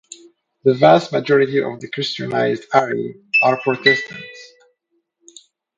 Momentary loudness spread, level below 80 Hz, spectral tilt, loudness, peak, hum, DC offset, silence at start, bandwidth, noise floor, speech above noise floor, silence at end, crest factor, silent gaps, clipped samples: 13 LU; -62 dBFS; -5.5 dB/octave; -17 LUFS; 0 dBFS; none; under 0.1%; 0.65 s; 9 kHz; -70 dBFS; 52 dB; 1.35 s; 18 dB; none; under 0.1%